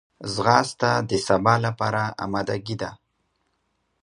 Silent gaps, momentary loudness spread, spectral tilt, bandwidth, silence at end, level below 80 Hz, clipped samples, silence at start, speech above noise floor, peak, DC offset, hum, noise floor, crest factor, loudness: none; 11 LU; -5 dB/octave; 11 kHz; 1.05 s; -54 dBFS; under 0.1%; 0.2 s; 50 dB; -2 dBFS; under 0.1%; none; -72 dBFS; 22 dB; -23 LUFS